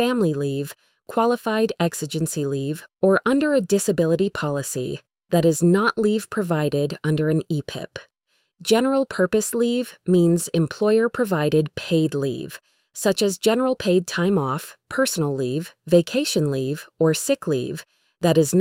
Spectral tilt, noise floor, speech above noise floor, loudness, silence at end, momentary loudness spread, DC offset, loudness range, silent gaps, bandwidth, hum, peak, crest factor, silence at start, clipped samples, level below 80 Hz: -5.5 dB/octave; -70 dBFS; 49 dB; -22 LUFS; 0 s; 11 LU; under 0.1%; 2 LU; none; 16.5 kHz; none; -4 dBFS; 16 dB; 0 s; under 0.1%; -58 dBFS